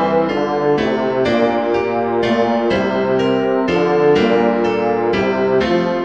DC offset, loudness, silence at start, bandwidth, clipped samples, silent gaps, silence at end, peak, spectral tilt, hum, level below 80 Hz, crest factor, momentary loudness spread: 0.3%; -16 LUFS; 0 s; 8 kHz; under 0.1%; none; 0 s; -2 dBFS; -7 dB/octave; none; -46 dBFS; 14 dB; 4 LU